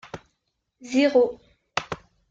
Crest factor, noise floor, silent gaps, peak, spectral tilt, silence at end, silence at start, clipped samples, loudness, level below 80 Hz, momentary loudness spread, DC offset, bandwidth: 18 dB; -77 dBFS; none; -8 dBFS; -4.5 dB/octave; 0.35 s; 0.15 s; under 0.1%; -23 LUFS; -62 dBFS; 21 LU; under 0.1%; 7.8 kHz